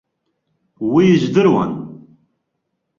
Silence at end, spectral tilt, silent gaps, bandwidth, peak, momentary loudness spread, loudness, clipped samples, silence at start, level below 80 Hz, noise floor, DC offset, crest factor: 1.05 s; -7.5 dB/octave; none; 7.2 kHz; -2 dBFS; 15 LU; -15 LUFS; under 0.1%; 0.8 s; -56 dBFS; -73 dBFS; under 0.1%; 16 dB